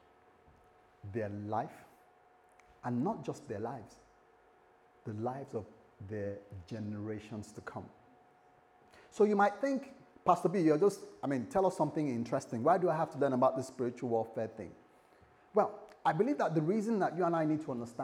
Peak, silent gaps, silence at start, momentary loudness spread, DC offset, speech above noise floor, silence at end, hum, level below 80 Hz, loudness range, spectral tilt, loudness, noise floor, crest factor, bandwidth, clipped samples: -12 dBFS; none; 1.05 s; 16 LU; under 0.1%; 31 dB; 0 s; none; -76 dBFS; 12 LU; -7.5 dB/octave; -34 LUFS; -65 dBFS; 22 dB; 13 kHz; under 0.1%